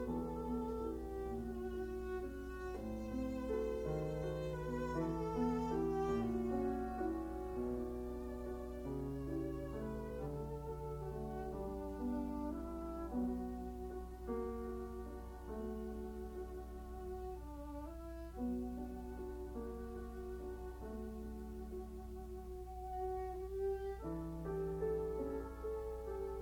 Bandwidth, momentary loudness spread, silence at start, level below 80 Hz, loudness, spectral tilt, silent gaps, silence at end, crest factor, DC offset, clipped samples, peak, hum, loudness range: 19 kHz; 10 LU; 0 s; -50 dBFS; -44 LUFS; -8 dB/octave; none; 0 s; 16 dB; under 0.1%; under 0.1%; -26 dBFS; none; 8 LU